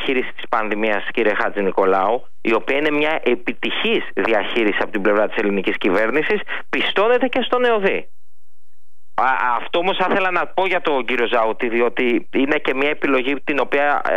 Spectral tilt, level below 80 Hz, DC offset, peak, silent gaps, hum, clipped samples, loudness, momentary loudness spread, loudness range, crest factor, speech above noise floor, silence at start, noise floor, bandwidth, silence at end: -6 dB/octave; -60 dBFS; 5%; -6 dBFS; none; none; under 0.1%; -19 LUFS; 4 LU; 2 LU; 14 dB; 50 dB; 0 s; -69 dBFS; 11 kHz; 0 s